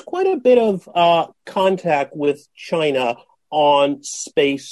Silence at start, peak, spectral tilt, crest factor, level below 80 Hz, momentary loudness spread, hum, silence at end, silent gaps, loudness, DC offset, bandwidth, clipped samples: 0.05 s; -4 dBFS; -4.5 dB/octave; 14 dB; -64 dBFS; 10 LU; none; 0 s; none; -18 LUFS; under 0.1%; 12 kHz; under 0.1%